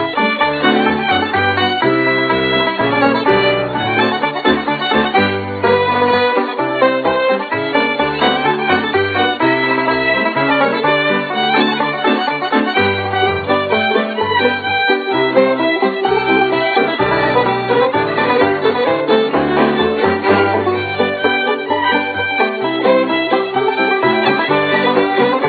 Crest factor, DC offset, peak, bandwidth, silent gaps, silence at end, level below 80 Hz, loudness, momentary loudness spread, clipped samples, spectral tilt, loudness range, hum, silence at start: 14 dB; under 0.1%; 0 dBFS; 4.9 kHz; none; 0 s; -48 dBFS; -14 LUFS; 3 LU; under 0.1%; -7.5 dB/octave; 1 LU; none; 0 s